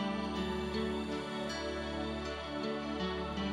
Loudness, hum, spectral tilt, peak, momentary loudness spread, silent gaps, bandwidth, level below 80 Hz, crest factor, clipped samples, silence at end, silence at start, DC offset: -37 LUFS; none; -5.5 dB/octave; -24 dBFS; 2 LU; none; 12.5 kHz; -52 dBFS; 12 dB; under 0.1%; 0 s; 0 s; under 0.1%